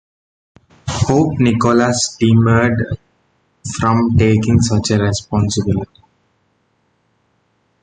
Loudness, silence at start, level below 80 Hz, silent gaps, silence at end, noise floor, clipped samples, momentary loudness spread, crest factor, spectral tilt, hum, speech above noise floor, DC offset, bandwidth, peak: -15 LUFS; 0.85 s; -36 dBFS; none; 1.95 s; -62 dBFS; under 0.1%; 12 LU; 16 dB; -6 dB/octave; none; 48 dB; under 0.1%; 9.4 kHz; -2 dBFS